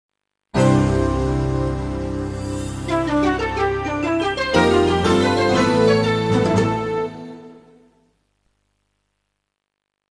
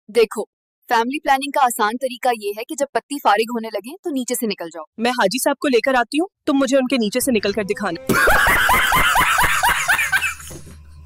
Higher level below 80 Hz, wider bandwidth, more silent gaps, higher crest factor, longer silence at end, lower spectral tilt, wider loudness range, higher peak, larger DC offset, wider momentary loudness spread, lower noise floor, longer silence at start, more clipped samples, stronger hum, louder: about the same, -34 dBFS vs -38 dBFS; second, 11 kHz vs 16.5 kHz; second, none vs 0.47-0.82 s, 2.89-2.93 s, 3.03-3.09 s, 3.99-4.03 s, 4.87-4.93 s; about the same, 18 dB vs 18 dB; first, 2.55 s vs 0 s; first, -6 dB/octave vs -3 dB/octave; about the same, 7 LU vs 5 LU; about the same, -2 dBFS vs -2 dBFS; neither; about the same, 10 LU vs 12 LU; first, -79 dBFS vs -39 dBFS; first, 0.55 s vs 0.1 s; neither; first, 50 Hz at -50 dBFS vs none; about the same, -19 LUFS vs -18 LUFS